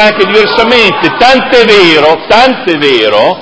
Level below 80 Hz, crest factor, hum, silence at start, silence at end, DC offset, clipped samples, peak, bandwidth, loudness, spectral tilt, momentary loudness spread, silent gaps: -38 dBFS; 6 dB; none; 0 s; 0 s; under 0.1%; 6%; 0 dBFS; 8 kHz; -5 LUFS; -4 dB/octave; 4 LU; none